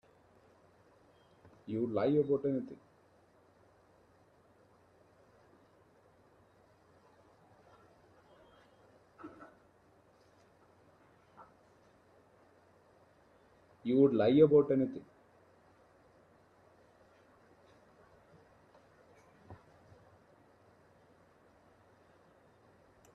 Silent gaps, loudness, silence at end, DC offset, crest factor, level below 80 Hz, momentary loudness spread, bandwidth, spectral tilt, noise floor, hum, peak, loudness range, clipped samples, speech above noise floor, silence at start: none; -30 LUFS; 3.6 s; under 0.1%; 26 dB; -76 dBFS; 32 LU; 6 kHz; -9.5 dB/octave; -67 dBFS; none; -14 dBFS; 11 LU; under 0.1%; 37 dB; 1.7 s